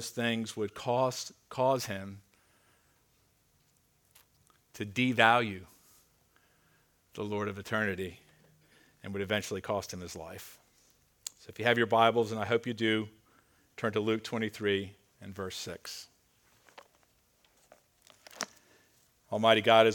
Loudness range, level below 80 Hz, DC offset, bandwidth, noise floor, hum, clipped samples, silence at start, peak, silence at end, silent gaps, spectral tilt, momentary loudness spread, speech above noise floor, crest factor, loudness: 15 LU; -72 dBFS; under 0.1%; 18.5 kHz; -70 dBFS; none; under 0.1%; 0 s; -8 dBFS; 0 s; none; -4.5 dB/octave; 21 LU; 40 dB; 26 dB; -31 LUFS